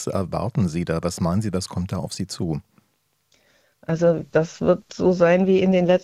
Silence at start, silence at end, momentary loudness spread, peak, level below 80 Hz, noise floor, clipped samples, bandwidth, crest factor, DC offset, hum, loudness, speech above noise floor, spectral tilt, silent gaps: 0 s; 0 s; 11 LU; -6 dBFS; -52 dBFS; -68 dBFS; under 0.1%; 14 kHz; 16 dB; under 0.1%; none; -22 LUFS; 48 dB; -6.5 dB/octave; none